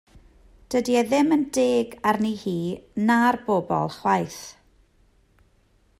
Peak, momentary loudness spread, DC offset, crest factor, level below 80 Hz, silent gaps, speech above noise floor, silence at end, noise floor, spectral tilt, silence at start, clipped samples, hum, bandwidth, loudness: -8 dBFS; 9 LU; under 0.1%; 18 dB; -58 dBFS; none; 39 dB; 1.5 s; -61 dBFS; -5.5 dB/octave; 0.7 s; under 0.1%; none; 16 kHz; -23 LUFS